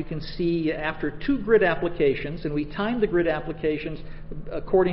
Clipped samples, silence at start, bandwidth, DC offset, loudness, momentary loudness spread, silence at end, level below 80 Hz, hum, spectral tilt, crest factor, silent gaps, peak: under 0.1%; 0 s; 5.8 kHz; under 0.1%; -25 LUFS; 14 LU; 0 s; -38 dBFS; none; -11 dB/octave; 16 dB; none; -8 dBFS